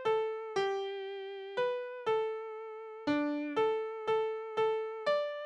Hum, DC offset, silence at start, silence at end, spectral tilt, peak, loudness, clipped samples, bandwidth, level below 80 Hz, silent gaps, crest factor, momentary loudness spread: none; under 0.1%; 0 s; 0 s; -5 dB/octave; -20 dBFS; -35 LUFS; under 0.1%; 8.4 kHz; -78 dBFS; none; 14 dB; 9 LU